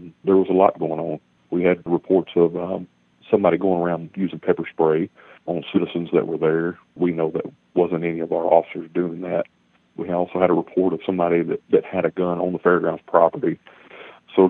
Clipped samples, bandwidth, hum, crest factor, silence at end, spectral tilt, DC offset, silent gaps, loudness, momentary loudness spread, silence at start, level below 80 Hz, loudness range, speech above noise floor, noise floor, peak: under 0.1%; 4 kHz; none; 20 dB; 0 s; -10.5 dB/octave; under 0.1%; none; -21 LUFS; 11 LU; 0 s; -64 dBFS; 2 LU; 23 dB; -43 dBFS; 0 dBFS